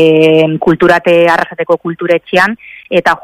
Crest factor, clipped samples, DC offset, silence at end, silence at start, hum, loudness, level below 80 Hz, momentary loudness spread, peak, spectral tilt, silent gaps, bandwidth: 10 dB; 0.5%; under 0.1%; 0.05 s; 0 s; none; -10 LUFS; -46 dBFS; 7 LU; 0 dBFS; -6 dB/octave; none; 15 kHz